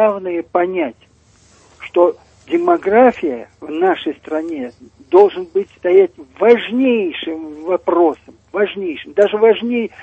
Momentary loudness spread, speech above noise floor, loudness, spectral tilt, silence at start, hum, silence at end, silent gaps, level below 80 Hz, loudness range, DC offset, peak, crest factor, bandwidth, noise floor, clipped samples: 14 LU; 35 dB; -16 LUFS; -6.5 dB/octave; 0 s; none; 0 s; none; -58 dBFS; 2 LU; under 0.1%; 0 dBFS; 16 dB; 8 kHz; -51 dBFS; under 0.1%